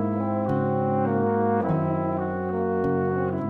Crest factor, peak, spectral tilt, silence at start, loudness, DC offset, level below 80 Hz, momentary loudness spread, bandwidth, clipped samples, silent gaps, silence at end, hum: 14 dB; -10 dBFS; -11.5 dB/octave; 0 s; -25 LUFS; under 0.1%; -54 dBFS; 4 LU; 4.3 kHz; under 0.1%; none; 0 s; none